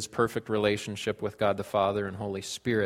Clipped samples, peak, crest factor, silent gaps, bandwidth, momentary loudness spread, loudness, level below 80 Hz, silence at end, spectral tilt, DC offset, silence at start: under 0.1%; -10 dBFS; 18 dB; none; 16 kHz; 6 LU; -30 LUFS; -62 dBFS; 0 s; -5 dB/octave; under 0.1%; 0 s